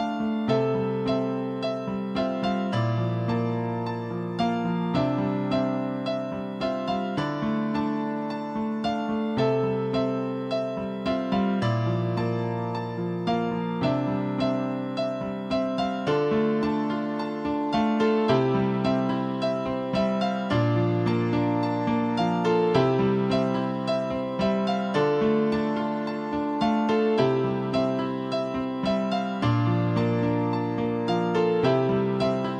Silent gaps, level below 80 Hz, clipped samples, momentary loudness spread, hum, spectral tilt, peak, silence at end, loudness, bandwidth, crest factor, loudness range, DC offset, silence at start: none; -56 dBFS; under 0.1%; 6 LU; none; -8 dB/octave; -10 dBFS; 0 s; -26 LUFS; 9.2 kHz; 16 dB; 3 LU; under 0.1%; 0 s